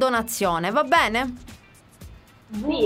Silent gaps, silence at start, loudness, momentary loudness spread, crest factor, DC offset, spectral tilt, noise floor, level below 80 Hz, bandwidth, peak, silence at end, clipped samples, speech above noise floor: none; 0 s; -22 LUFS; 15 LU; 18 dB; under 0.1%; -3.5 dB/octave; -49 dBFS; -48 dBFS; 16 kHz; -6 dBFS; 0 s; under 0.1%; 27 dB